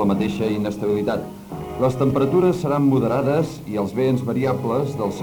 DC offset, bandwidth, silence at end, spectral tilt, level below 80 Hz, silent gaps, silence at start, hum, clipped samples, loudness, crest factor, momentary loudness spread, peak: under 0.1%; over 20 kHz; 0 s; -8 dB/octave; -48 dBFS; none; 0 s; none; under 0.1%; -21 LUFS; 14 dB; 8 LU; -6 dBFS